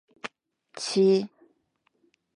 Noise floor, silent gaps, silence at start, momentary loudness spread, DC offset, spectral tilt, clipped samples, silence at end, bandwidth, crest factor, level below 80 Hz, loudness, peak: -73 dBFS; none; 0.25 s; 20 LU; under 0.1%; -5 dB/octave; under 0.1%; 1.1 s; 11 kHz; 16 dB; -80 dBFS; -24 LUFS; -12 dBFS